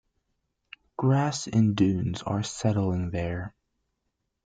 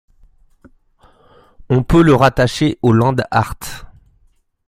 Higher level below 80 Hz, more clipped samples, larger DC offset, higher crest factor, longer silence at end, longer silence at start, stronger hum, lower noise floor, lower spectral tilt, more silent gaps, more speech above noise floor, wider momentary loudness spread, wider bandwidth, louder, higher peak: second, -54 dBFS vs -34 dBFS; neither; neither; about the same, 18 dB vs 16 dB; first, 0.95 s vs 0.8 s; second, 1 s vs 1.7 s; neither; first, -80 dBFS vs -56 dBFS; about the same, -6.5 dB/octave vs -6.5 dB/octave; neither; first, 54 dB vs 43 dB; second, 10 LU vs 17 LU; second, 9.2 kHz vs 15.5 kHz; second, -27 LUFS vs -14 LUFS; second, -10 dBFS vs 0 dBFS